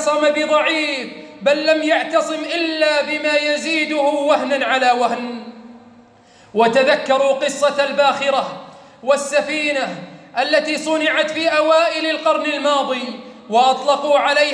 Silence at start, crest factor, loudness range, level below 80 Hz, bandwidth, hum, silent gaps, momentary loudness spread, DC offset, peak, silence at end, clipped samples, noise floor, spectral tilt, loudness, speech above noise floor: 0 s; 14 dB; 2 LU; -70 dBFS; 10.5 kHz; none; none; 11 LU; under 0.1%; -4 dBFS; 0 s; under 0.1%; -48 dBFS; -2.5 dB/octave; -17 LUFS; 31 dB